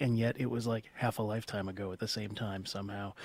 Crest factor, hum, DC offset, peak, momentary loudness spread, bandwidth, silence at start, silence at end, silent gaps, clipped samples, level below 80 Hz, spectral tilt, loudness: 18 dB; none; under 0.1%; -16 dBFS; 7 LU; 16 kHz; 0 s; 0 s; none; under 0.1%; -64 dBFS; -6 dB/octave; -36 LUFS